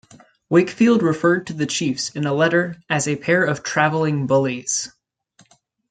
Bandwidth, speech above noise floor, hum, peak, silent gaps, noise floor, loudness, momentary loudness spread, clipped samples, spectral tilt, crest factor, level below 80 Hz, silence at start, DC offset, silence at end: 9.4 kHz; 39 dB; none; -2 dBFS; none; -57 dBFS; -19 LUFS; 7 LU; under 0.1%; -4.5 dB/octave; 18 dB; -62 dBFS; 0.5 s; under 0.1%; 1.05 s